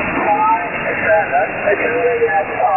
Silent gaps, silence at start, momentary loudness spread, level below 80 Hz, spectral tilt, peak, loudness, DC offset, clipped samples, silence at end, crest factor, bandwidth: none; 0 s; 3 LU; -46 dBFS; -9 dB/octave; -2 dBFS; -15 LUFS; under 0.1%; under 0.1%; 0 s; 12 dB; 3 kHz